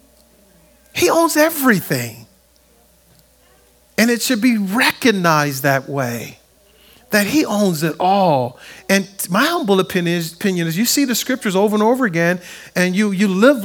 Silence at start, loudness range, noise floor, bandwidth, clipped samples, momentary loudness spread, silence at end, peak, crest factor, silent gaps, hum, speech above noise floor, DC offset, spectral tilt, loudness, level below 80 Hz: 0.95 s; 2 LU; -53 dBFS; over 20 kHz; under 0.1%; 9 LU; 0 s; 0 dBFS; 18 dB; none; none; 37 dB; under 0.1%; -4.5 dB/octave; -16 LUFS; -58 dBFS